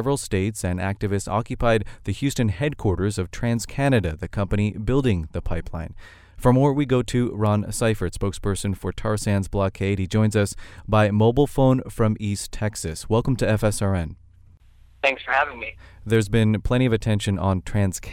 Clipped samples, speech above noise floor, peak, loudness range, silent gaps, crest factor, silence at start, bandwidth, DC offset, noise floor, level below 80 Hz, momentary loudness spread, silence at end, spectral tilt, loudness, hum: under 0.1%; 29 dB; -4 dBFS; 3 LU; none; 18 dB; 0 s; 16 kHz; under 0.1%; -51 dBFS; -36 dBFS; 9 LU; 0 s; -6 dB/octave; -23 LUFS; none